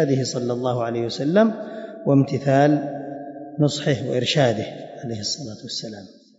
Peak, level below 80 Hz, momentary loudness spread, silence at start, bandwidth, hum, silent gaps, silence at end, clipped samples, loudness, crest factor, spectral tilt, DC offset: -6 dBFS; -64 dBFS; 16 LU; 0 s; 8 kHz; none; none; 0.25 s; under 0.1%; -22 LUFS; 16 dB; -6 dB/octave; under 0.1%